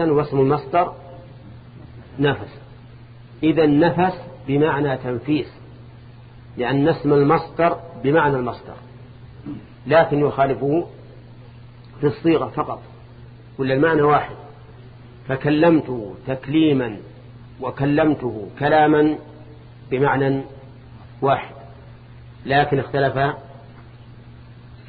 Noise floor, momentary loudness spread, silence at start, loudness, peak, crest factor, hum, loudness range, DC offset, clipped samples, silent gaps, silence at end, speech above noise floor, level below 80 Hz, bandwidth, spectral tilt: -42 dBFS; 21 LU; 0 s; -19 LUFS; -4 dBFS; 18 dB; none; 4 LU; under 0.1%; under 0.1%; none; 0.05 s; 23 dB; -48 dBFS; 5 kHz; -10.5 dB/octave